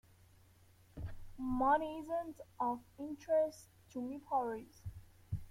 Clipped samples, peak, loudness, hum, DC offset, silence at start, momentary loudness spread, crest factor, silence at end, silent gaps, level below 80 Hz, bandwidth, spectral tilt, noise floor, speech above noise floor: under 0.1%; -20 dBFS; -38 LUFS; none; under 0.1%; 0.95 s; 19 LU; 20 dB; 0 s; none; -58 dBFS; 16.5 kHz; -7 dB/octave; -65 dBFS; 28 dB